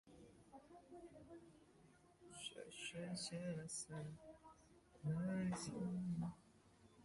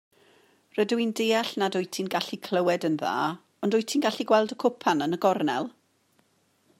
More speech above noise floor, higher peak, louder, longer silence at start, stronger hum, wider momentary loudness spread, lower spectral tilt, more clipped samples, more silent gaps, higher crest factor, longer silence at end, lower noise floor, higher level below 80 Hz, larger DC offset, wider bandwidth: second, 23 dB vs 42 dB; second, -34 dBFS vs -8 dBFS; second, -48 LUFS vs -26 LUFS; second, 0.05 s vs 0.75 s; neither; first, 22 LU vs 6 LU; about the same, -5 dB/octave vs -4.5 dB/octave; neither; neither; about the same, 16 dB vs 20 dB; second, 0 s vs 1.1 s; about the same, -70 dBFS vs -68 dBFS; about the same, -74 dBFS vs -76 dBFS; neither; second, 11.5 kHz vs 16 kHz